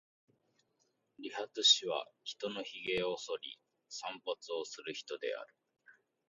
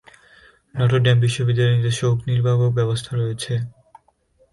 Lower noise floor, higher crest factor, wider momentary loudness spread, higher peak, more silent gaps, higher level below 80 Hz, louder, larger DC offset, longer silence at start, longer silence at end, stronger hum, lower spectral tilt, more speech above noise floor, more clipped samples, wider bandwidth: first, -79 dBFS vs -60 dBFS; first, 26 dB vs 14 dB; first, 20 LU vs 9 LU; second, -14 dBFS vs -6 dBFS; neither; second, -78 dBFS vs -50 dBFS; second, -36 LUFS vs -20 LUFS; neither; first, 1.2 s vs 0.75 s; second, 0.35 s vs 0.85 s; neither; second, -1 dB/octave vs -6 dB/octave; about the same, 41 dB vs 42 dB; neither; second, 8.2 kHz vs 11.5 kHz